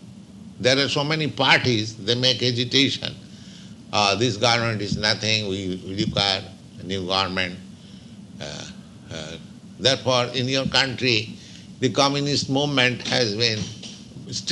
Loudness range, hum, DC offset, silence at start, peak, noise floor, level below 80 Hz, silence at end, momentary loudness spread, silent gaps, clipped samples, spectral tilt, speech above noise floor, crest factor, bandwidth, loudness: 6 LU; none; under 0.1%; 0 s; -2 dBFS; -42 dBFS; -54 dBFS; 0 s; 20 LU; none; under 0.1%; -4 dB/octave; 20 dB; 22 dB; 11.5 kHz; -21 LUFS